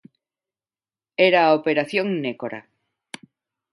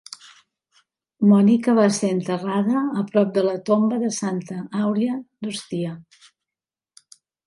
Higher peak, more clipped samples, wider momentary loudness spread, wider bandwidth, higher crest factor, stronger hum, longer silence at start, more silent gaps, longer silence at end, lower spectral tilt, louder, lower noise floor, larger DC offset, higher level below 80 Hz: about the same, -2 dBFS vs -4 dBFS; neither; first, 24 LU vs 14 LU; about the same, 11.5 kHz vs 11.5 kHz; about the same, 20 dB vs 18 dB; neither; about the same, 1.2 s vs 1.2 s; neither; second, 1.1 s vs 1.45 s; about the same, -5.5 dB/octave vs -6 dB/octave; about the same, -20 LUFS vs -21 LUFS; about the same, under -90 dBFS vs -90 dBFS; neither; about the same, -74 dBFS vs -70 dBFS